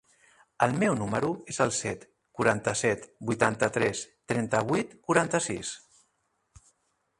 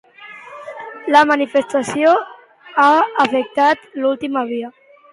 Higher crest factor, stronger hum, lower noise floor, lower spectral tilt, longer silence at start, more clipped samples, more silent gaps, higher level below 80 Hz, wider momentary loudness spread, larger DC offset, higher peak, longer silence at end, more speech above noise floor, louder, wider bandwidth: first, 22 dB vs 16 dB; neither; first, -75 dBFS vs -38 dBFS; about the same, -4.5 dB/octave vs -4 dB/octave; first, 0.6 s vs 0.2 s; neither; neither; about the same, -62 dBFS vs -66 dBFS; second, 10 LU vs 21 LU; neither; second, -6 dBFS vs 0 dBFS; first, 1.4 s vs 0.4 s; first, 47 dB vs 23 dB; second, -28 LUFS vs -16 LUFS; about the same, 11.5 kHz vs 11.5 kHz